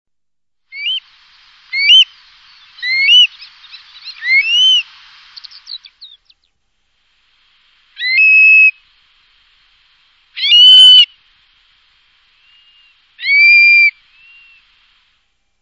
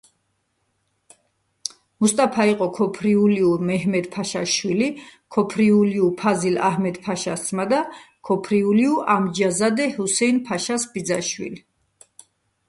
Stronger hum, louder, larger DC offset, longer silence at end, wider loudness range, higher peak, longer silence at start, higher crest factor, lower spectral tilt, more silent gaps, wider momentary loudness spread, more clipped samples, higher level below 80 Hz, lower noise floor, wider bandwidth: neither; first, -6 LUFS vs -21 LUFS; neither; first, 1.7 s vs 1.1 s; first, 8 LU vs 2 LU; first, 0 dBFS vs -4 dBFS; second, 0.75 s vs 2 s; about the same, 14 dB vs 16 dB; second, 6.5 dB/octave vs -4.5 dB/octave; neither; first, 20 LU vs 9 LU; first, 0.3% vs under 0.1%; about the same, -68 dBFS vs -64 dBFS; first, -85 dBFS vs -71 dBFS; about the same, 11 kHz vs 11.5 kHz